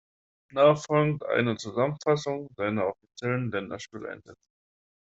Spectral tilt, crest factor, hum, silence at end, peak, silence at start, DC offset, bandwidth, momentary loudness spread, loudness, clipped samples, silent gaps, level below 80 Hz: -6.5 dB/octave; 22 dB; none; 0.85 s; -8 dBFS; 0.55 s; under 0.1%; 8 kHz; 16 LU; -27 LUFS; under 0.1%; none; -66 dBFS